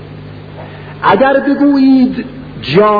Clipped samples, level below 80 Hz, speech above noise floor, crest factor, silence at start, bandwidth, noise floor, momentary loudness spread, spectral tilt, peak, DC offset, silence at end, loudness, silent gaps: under 0.1%; -42 dBFS; 20 dB; 12 dB; 0 s; 5 kHz; -29 dBFS; 21 LU; -8.5 dB/octave; 0 dBFS; 0.1%; 0 s; -10 LUFS; none